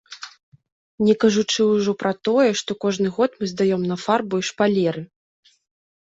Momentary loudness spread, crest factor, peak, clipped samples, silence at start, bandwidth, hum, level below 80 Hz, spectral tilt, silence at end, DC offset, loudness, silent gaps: 10 LU; 18 dB; -4 dBFS; under 0.1%; 0.1 s; 8 kHz; none; -62 dBFS; -5 dB/octave; 0.95 s; under 0.1%; -20 LUFS; 0.43-0.52 s, 0.72-0.98 s